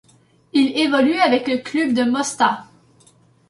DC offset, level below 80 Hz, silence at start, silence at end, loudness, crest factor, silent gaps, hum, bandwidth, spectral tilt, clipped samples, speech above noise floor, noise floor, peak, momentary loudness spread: under 0.1%; -64 dBFS; 0.55 s; 0.85 s; -18 LUFS; 16 dB; none; none; 11.5 kHz; -3.5 dB/octave; under 0.1%; 36 dB; -54 dBFS; -4 dBFS; 6 LU